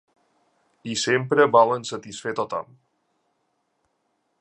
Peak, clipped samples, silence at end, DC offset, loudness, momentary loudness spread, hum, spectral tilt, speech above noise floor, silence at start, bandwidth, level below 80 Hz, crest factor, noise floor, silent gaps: -4 dBFS; under 0.1%; 1.75 s; under 0.1%; -22 LUFS; 16 LU; none; -4 dB/octave; 51 dB; 0.85 s; 11 kHz; -70 dBFS; 22 dB; -73 dBFS; none